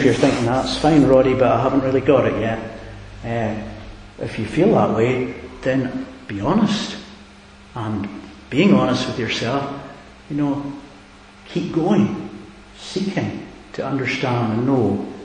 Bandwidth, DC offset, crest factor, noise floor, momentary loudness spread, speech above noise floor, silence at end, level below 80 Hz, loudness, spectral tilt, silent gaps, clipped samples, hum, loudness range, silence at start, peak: 10.5 kHz; under 0.1%; 20 dB; -44 dBFS; 19 LU; 25 dB; 0 s; -44 dBFS; -19 LUFS; -6.5 dB/octave; none; under 0.1%; none; 6 LU; 0 s; 0 dBFS